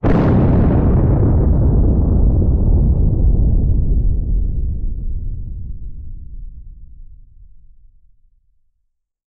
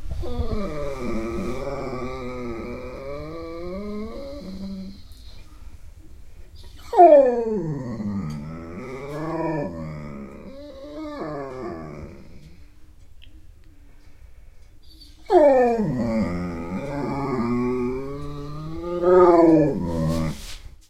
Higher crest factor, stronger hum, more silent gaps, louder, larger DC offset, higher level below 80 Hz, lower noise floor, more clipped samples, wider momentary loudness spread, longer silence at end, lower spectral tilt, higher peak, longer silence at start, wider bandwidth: second, 10 dB vs 22 dB; neither; neither; first, -16 LUFS vs -22 LUFS; neither; first, -18 dBFS vs -40 dBFS; first, -68 dBFS vs -45 dBFS; neither; about the same, 20 LU vs 21 LU; first, 2.2 s vs 0.2 s; first, -12 dB/octave vs -8 dB/octave; second, -6 dBFS vs -2 dBFS; about the same, 0.05 s vs 0 s; second, 3.4 kHz vs 13.5 kHz